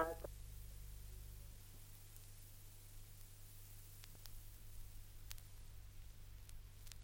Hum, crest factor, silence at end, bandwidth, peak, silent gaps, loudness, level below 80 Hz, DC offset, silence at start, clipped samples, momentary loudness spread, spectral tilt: none; 28 dB; 0 s; 16.5 kHz; -26 dBFS; none; -57 LUFS; -56 dBFS; under 0.1%; 0 s; under 0.1%; 4 LU; -4 dB/octave